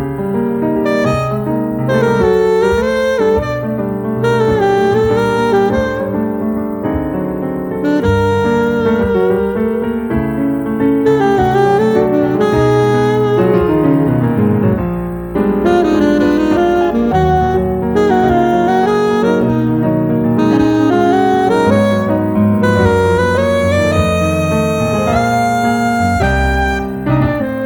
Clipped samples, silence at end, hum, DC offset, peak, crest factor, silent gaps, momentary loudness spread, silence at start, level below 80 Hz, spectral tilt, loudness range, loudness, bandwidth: under 0.1%; 0 s; none; under 0.1%; 0 dBFS; 12 dB; none; 6 LU; 0 s; -30 dBFS; -7.5 dB/octave; 3 LU; -13 LUFS; 17 kHz